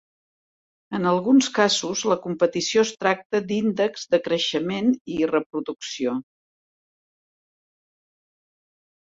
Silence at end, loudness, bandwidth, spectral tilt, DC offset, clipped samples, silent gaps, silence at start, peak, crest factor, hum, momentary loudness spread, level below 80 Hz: 2.95 s; -23 LUFS; 8 kHz; -4 dB/octave; under 0.1%; under 0.1%; 3.25-3.30 s, 5.01-5.05 s, 5.46-5.50 s; 0.9 s; -4 dBFS; 20 dB; none; 9 LU; -66 dBFS